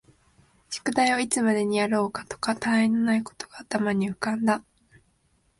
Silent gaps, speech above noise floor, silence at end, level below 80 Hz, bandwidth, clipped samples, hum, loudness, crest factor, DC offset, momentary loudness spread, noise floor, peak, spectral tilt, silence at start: none; 42 dB; 1 s; -64 dBFS; 11.5 kHz; under 0.1%; none; -25 LUFS; 18 dB; under 0.1%; 9 LU; -67 dBFS; -8 dBFS; -4.5 dB/octave; 0.7 s